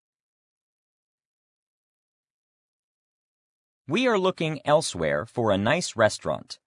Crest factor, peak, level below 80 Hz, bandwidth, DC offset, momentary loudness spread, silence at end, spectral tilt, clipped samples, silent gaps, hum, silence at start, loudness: 22 dB; -6 dBFS; -62 dBFS; 11 kHz; under 0.1%; 6 LU; 0.1 s; -4.5 dB/octave; under 0.1%; none; none; 3.9 s; -24 LUFS